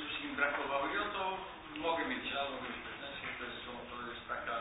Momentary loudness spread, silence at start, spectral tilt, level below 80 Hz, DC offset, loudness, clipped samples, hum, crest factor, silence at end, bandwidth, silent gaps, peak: 10 LU; 0 s; 1.5 dB/octave; -64 dBFS; under 0.1%; -38 LUFS; under 0.1%; none; 20 dB; 0 s; 3.9 kHz; none; -18 dBFS